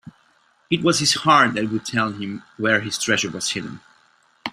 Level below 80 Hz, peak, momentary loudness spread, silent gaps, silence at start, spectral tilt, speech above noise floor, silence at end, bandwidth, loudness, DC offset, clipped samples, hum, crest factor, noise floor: -60 dBFS; -2 dBFS; 15 LU; none; 0.05 s; -3 dB/octave; 39 dB; 0 s; 15.5 kHz; -20 LUFS; under 0.1%; under 0.1%; none; 20 dB; -60 dBFS